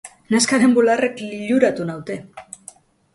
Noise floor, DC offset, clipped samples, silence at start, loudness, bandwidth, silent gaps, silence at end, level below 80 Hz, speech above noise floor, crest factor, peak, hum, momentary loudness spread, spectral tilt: -46 dBFS; under 0.1%; under 0.1%; 0.05 s; -18 LUFS; 11.5 kHz; none; 0.75 s; -62 dBFS; 28 dB; 18 dB; -2 dBFS; none; 23 LU; -4 dB/octave